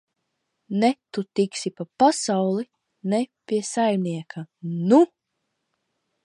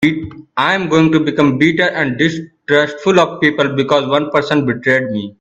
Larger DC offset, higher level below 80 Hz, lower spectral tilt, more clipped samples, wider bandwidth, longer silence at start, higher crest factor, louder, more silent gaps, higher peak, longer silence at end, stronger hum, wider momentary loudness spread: neither; second, -76 dBFS vs -50 dBFS; about the same, -5.5 dB/octave vs -6 dB/octave; neither; first, 11.5 kHz vs 8.2 kHz; first, 0.7 s vs 0 s; first, 20 dB vs 14 dB; second, -23 LUFS vs -14 LUFS; neither; second, -6 dBFS vs 0 dBFS; first, 1.2 s vs 0.1 s; neither; first, 14 LU vs 5 LU